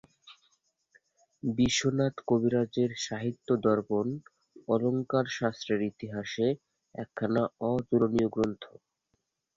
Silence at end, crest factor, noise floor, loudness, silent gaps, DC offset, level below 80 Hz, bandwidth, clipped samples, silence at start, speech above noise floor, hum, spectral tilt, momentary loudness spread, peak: 0.9 s; 20 dB; -79 dBFS; -30 LUFS; none; under 0.1%; -60 dBFS; 8 kHz; under 0.1%; 0.25 s; 50 dB; none; -5.5 dB/octave; 12 LU; -12 dBFS